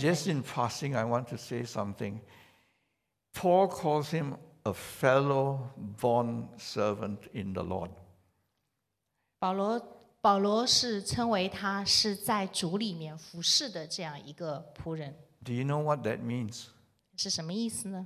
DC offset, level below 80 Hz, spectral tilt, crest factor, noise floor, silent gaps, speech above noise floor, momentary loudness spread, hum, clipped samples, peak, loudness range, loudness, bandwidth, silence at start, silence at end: under 0.1%; -62 dBFS; -4 dB/octave; 22 dB; -83 dBFS; none; 52 dB; 15 LU; none; under 0.1%; -10 dBFS; 8 LU; -31 LUFS; 15.5 kHz; 0 s; 0 s